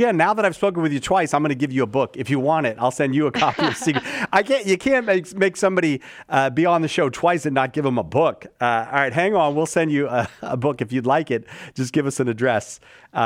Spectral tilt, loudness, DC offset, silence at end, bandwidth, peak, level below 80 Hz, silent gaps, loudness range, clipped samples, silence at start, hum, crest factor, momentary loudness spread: -5.5 dB/octave; -20 LUFS; under 0.1%; 0 s; 15.5 kHz; -2 dBFS; -58 dBFS; none; 2 LU; under 0.1%; 0 s; none; 18 dB; 5 LU